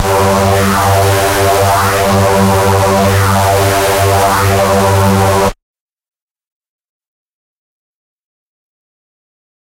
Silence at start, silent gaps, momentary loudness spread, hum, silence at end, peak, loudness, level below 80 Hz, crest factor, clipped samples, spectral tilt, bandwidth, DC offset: 0 s; none; 1 LU; none; 4.15 s; -2 dBFS; -10 LUFS; -32 dBFS; 10 dB; under 0.1%; -5 dB/octave; 16 kHz; under 0.1%